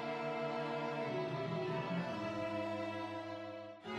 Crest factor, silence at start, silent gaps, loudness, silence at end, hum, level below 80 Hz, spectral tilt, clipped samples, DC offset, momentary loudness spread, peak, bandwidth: 12 dB; 0 s; none; -41 LUFS; 0 s; none; -78 dBFS; -6.5 dB/octave; under 0.1%; under 0.1%; 6 LU; -28 dBFS; 12 kHz